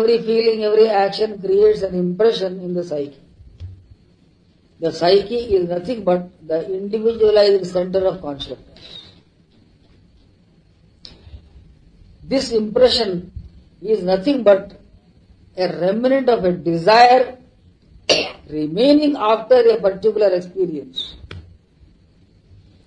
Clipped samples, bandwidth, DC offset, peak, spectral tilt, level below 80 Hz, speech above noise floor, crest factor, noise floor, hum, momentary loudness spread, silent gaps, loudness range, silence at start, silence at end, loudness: under 0.1%; 10 kHz; under 0.1%; 0 dBFS; -5.5 dB/octave; -48 dBFS; 38 dB; 18 dB; -54 dBFS; none; 18 LU; none; 7 LU; 0 s; 1.45 s; -17 LUFS